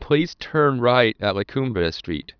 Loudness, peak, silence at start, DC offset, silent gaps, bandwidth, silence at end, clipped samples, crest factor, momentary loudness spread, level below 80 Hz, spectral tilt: -21 LUFS; -2 dBFS; 0 s; under 0.1%; none; 5.4 kHz; 0.2 s; under 0.1%; 18 dB; 7 LU; -46 dBFS; -7 dB/octave